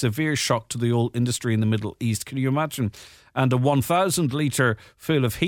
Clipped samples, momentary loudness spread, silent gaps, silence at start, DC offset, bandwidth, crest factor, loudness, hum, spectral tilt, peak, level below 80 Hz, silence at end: under 0.1%; 6 LU; none; 0 s; under 0.1%; 17.5 kHz; 16 dB; -23 LUFS; none; -5.5 dB/octave; -6 dBFS; -54 dBFS; 0 s